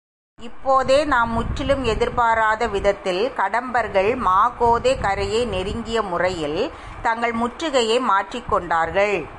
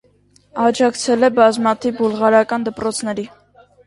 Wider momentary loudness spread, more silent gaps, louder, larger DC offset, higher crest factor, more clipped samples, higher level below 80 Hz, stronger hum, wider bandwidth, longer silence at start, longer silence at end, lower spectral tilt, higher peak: second, 7 LU vs 12 LU; neither; second, -20 LUFS vs -16 LUFS; neither; about the same, 14 dB vs 18 dB; neither; first, -38 dBFS vs -56 dBFS; second, none vs 50 Hz at -55 dBFS; about the same, 11.5 kHz vs 11.5 kHz; second, 0.4 s vs 0.55 s; second, 0 s vs 0.6 s; about the same, -4.5 dB/octave vs -4 dB/octave; second, -6 dBFS vs 0 dBFS